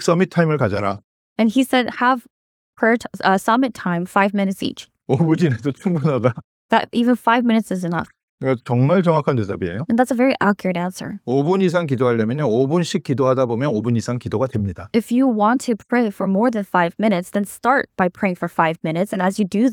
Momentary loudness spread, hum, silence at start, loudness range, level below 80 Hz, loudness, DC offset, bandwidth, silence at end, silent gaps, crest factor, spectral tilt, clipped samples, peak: 8 LU; none; 0 s; 1 LU; -58 dBFS; -19 LUFS; under 0.1%; 17 kHz; 0 s; 1.04-1.36 s, 2.30-2.73 s, 6.44-6.69 s, 8.23-8.38 s; 18 dB; -6.5 dB/octave; under 0.1%; 0 dBFS